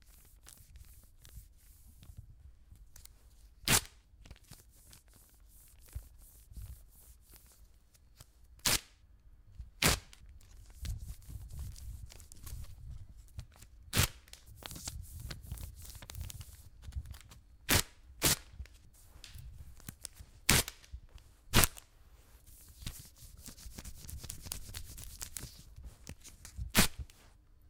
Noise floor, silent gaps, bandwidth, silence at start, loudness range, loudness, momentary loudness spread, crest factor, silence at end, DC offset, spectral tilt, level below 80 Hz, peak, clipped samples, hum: -62 dBFS; none; 18 kHz; 0.1 s; 21 LU; -34 LUFS; 28 LU; 38 dB; 0.15 s; under 0.1%; -2.5 dB/octave; -48 dBFS; -2 dBFS; under 0.1%; none